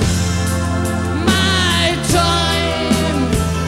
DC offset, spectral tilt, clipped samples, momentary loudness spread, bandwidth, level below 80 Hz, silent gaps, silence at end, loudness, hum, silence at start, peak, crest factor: under 0.1%; -4.5 dB/octave; under 0.1%; 5 LU; 15.5 kHz; -28 dBFS; none; 0 s; -16 LUFS; none; 0 s; 0 dBFS; 14 dB